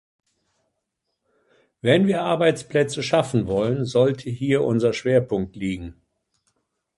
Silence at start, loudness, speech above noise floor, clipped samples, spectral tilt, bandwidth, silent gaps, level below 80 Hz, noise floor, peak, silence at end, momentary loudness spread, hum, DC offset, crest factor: 1.85 s; -21 LUFS; 57 dB; under 0.1%; -6 dB/octave; 11.5 kHz; none; -52 dBFS; -78 dBFS; -4 dBFS; 1.05 s; 9 LU; none; under 0.1%; 20 dB